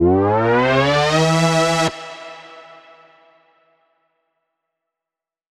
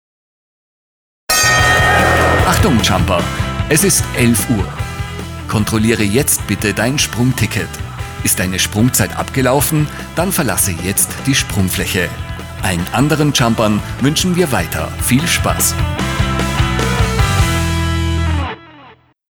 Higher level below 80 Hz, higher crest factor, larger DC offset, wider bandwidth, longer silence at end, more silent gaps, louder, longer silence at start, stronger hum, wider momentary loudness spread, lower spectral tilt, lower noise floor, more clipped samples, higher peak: second, -48 dBFS vs -26 dBFS; about the same, 16 dB vs 14 dB; neither; second, 13.5 kHz vs over 20 kHz; first, 2.95 s vs 0.4 s; neither; about the same, -16 LUFS vs -14 LUFS; second, 0 s vs 1.3 s; neither; first, 19 LU vs 9 LU; about the same, -5 dB/octave vs -4 dB/octave; first, -88 dBFS vs -43 dBFS; neither; about the same, -2 dBFS vs -2 dBFS